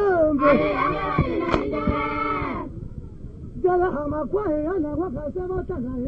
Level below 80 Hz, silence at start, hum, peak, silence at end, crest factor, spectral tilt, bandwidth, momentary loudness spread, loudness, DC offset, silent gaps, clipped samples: -38 dBFS; 0 s; none; -4 dBFS; 0 s; 20 dB; -8.5 dB/octave; 7.6 kHz; 17 LU; -23 LUFS; under 0.1%; none; under 0.1%